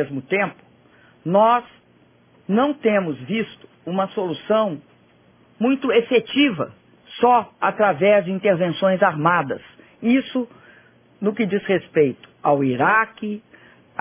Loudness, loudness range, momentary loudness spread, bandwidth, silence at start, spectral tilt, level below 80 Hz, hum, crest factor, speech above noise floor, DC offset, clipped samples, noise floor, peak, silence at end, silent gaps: -20 LUFS; 4 LU; 13 LU; 3.6 kHz; 0 s; -10 dB/octave; -64 dBFS; none; 18 dB; 36 dB; under 0.1%; under 0.1%; -55 dBFS; -4 dBFS; 0.6 s; none